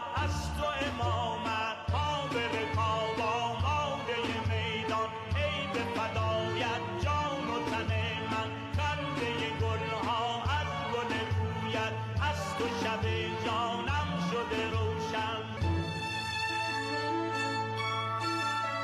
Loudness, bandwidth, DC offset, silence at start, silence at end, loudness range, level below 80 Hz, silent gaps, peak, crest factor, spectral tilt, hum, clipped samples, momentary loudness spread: -32 LUFS; 13.5 kHz; under 0.1%; 0 s; 0 s; 1 LU; -50 dBFS; none; -22 dBFS; 12 dB; -5 dB/octave; none; under 0.1%; 2 LU